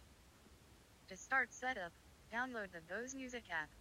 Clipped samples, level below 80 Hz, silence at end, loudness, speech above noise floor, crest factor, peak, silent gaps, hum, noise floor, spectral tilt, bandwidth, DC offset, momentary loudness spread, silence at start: under 0.1%; -70 dBFS; 0 s; -43 LUFS; 21 dB; 22 dB; -24 dBFS; none; none; -65 dBFS; -2.5 dB/octave; 16 kHz; under 0.1%; 18 LU; 0 s